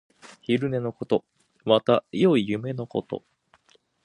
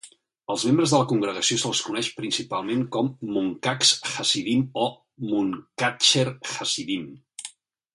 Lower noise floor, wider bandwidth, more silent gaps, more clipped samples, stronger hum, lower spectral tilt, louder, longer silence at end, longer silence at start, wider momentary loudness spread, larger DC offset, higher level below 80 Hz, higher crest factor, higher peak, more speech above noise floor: first, -63 dBFS vs -45 dBFS; about the same, 11 kHz vs 11.5 kHz; neither; neither; neither; first, -7.5 dB/octave vs -3 dB/octave; about the same, -25 LUFS vs -23 LUFS; first, 0.85 s vs 0.45 s; first, 0.5 s vs 0.05 s; first, 15 LU vs 12 LU; neither; about the same, -64 dBFS vs -66 dBFS; about the same, 22 dB vs 20 dB; about the same, -4 dBFS vs -4 dBFS; first, 39 dB vs 20 dB